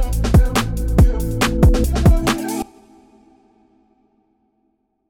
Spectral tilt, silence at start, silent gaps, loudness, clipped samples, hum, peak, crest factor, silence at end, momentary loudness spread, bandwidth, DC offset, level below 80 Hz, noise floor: -6 dB/octave; 0 s; none; -17 LUFS; under 0.1%; none; -4 dBFS; 12 dB; 2.45 s; 8 LU; 18 kHz; under 0.1%; -20 dBFS; -67 dBFS